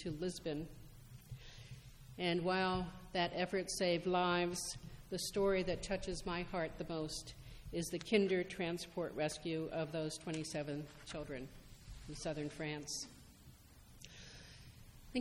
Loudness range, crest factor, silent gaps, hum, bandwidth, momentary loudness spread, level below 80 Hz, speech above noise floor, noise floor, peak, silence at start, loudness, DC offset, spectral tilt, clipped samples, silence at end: 9 LU; 20 dB; none; none; 16.5 kHz; 21 LU; -58 dBFS; 21 dB; -61 dBFS; -20 dBFS; 0 s; -40 LUFS; under 0.1%; -4.5 dB/octave; under 0.1%; 0 s